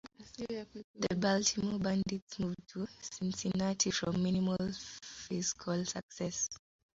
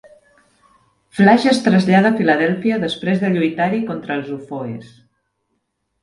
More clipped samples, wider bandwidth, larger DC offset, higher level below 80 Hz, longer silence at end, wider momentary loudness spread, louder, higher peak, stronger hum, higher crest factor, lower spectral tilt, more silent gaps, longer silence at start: neither; second, 7.8 kHz vs 11.5 kHz; neither; about the same, -64 dBFS vs -60 dBFS; second, 0.35 s vs 1.2 s; second, 12 LU vs 15 LU; second, -35 LUFS vs -16 LUFS; second, -16 dBFS vs 0 dBFS; neither; about the same, 20 dB vs 18 dB; second, -5 dB/octave vs -6.5 dB/octave; first, 0.84-0.94 s, 2.22-2.27 s, 6.03-6.09 s vs none; second, 0.05 s vs 1.15 s